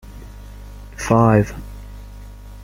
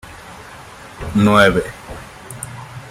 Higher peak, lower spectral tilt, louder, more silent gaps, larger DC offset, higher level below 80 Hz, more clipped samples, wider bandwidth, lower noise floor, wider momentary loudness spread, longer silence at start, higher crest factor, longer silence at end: about the same, -2 dBFS vs -2 dBFS; first, -7.5 dB/octave vs -5.5 dB/octave; second, -17 LUFS vs -14 LUFS; neither; neither; about the same, -36 dBFS vs -40 dBFS; neither; about the same, 15.5 kHz vs 15.5 kHz; about the same, -36 dBFS vs -37 dBFS; about the same, 25 LU vs 25 LU; about the same, 0.1 s vs 0.05 s; about the same, 20 dB vs 18 dB; about the same, 0 s vs 0 s